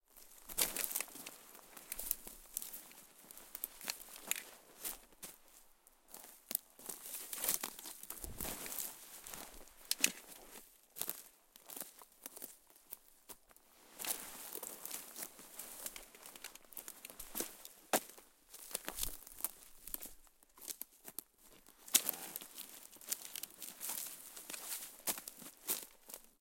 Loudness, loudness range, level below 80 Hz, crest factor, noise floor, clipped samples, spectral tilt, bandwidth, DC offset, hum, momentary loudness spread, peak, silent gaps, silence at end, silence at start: -42 LUFS; 7 LU; -66 dBFS; 36 dB; -66 dBFS; under 0.1%; 0 dB/octave; 17 kHz; under 0.1%; none; 19 LU; -10 dBFS; none; 0.1 s; 0.1 s